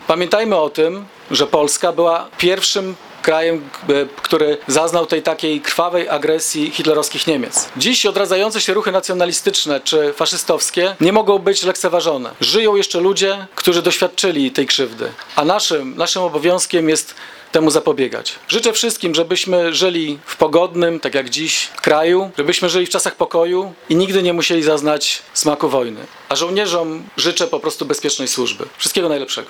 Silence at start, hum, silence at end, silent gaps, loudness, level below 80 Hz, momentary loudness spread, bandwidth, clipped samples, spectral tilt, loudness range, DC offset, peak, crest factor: 0 s; none; 0 s; none; -16 LUFS; -60 dBFS; 6 LU; 19 kHz; under 0.1%; -2.5 dB/octave; 2 LU; under 0.1%; 0 dBFS; 16 dB